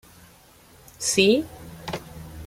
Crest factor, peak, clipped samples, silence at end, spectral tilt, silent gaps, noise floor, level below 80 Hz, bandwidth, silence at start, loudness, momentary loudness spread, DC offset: 22 dB; -4 dBFS; under 0.1%; 0 s; -3 dB/octave; none; -52 dBFS; -52 dBFS; 16.5 kHz; 1 s; -22 LUFS; 20 LU; under 0.1%